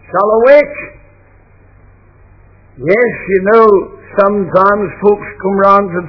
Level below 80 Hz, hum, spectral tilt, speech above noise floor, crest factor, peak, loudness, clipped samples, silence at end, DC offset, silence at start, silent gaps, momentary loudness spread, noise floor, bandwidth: -44 dBFS; none; -9 dB/octave; 34 dB; 12 dB; 0 dBFS; -10 LUFS; 0.8%; 0 s; under 0.1%; 0.1 s; none; 12 LU; -44 dBFS; 5.4 kHz